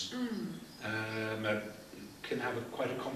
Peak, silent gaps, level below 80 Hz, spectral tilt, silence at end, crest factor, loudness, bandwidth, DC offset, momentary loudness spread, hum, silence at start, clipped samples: -20 dBFS; none; -70 dBFS; -5 dB/octave; 0 s; 18 dB; -38 LUFS; 15 kHz; under 0.1%; 11 LU; none; 0 s; under 0.1%